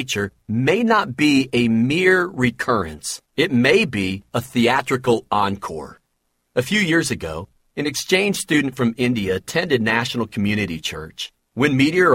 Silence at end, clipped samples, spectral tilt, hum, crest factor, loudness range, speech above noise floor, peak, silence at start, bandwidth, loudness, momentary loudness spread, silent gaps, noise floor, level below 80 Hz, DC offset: 0 s; under 0.1%; -5 dB/octave; none; 18 dB; 4 LU; 51 dB; -2 dBFS; 0 s; 16.5 kHz; -19 LUFS; 12 LU; none; -70 dBFS; -50 dBFS; under 0.1%